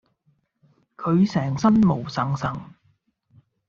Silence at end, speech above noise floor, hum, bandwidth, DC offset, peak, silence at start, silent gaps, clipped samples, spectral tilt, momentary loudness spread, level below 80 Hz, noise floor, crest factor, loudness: 1.05 s; 46 dB; none; 7.4 kHz; under 0.1%; -8 dBFS; 1 s; none; under 0.1%; -7.5 dB/octave; 12 LU; -54 dBFS; -67 dBFS; 16 dB; -22 LUFS